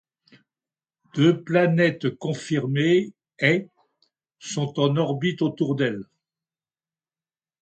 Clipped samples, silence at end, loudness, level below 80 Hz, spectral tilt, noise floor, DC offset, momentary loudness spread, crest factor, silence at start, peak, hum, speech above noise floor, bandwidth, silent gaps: under 0.1%; 1.55 s; -23 LUFS; -68 dBFS; -6.5 dB/octave; under -90 dBFS; under 0.1%; 11 LU; 20 dB; 1.15 s; -6 dBFS; none; over 68 dB; 9 kHz; none